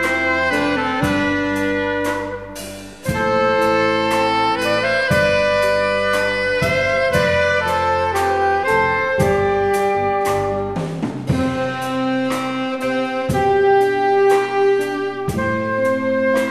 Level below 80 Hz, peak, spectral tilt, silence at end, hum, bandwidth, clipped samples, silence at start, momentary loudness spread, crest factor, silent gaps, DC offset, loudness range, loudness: -42 dBFS; -4 dBFS; -5 dB/octave; 0 s; none; 14 kHz; under 0.1%; 0 s; 7 LU; 14 dB; none; 0.4%; 3 LU; -18 LUFS